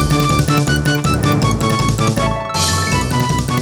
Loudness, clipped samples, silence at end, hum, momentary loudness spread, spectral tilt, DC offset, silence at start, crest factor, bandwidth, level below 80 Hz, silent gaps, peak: -15 LUFS; under 0.1%; 0 s; none; 2 LU; -5 dB/octave; under 0.1%; 0 s; 12 dB; over 20 kHz; -28 dBFS; none; -2 dBFS